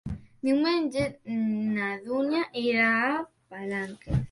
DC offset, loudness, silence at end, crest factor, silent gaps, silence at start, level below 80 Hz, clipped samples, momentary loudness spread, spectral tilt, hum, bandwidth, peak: under 0.1%; -27 LUFS; 0.05 s; 16 dB; none; 0.05 s; -48 dBFS; under 0.1%; 11 LU; -6.5 dB/octave; none; 11.5 kHz; -12 dBFS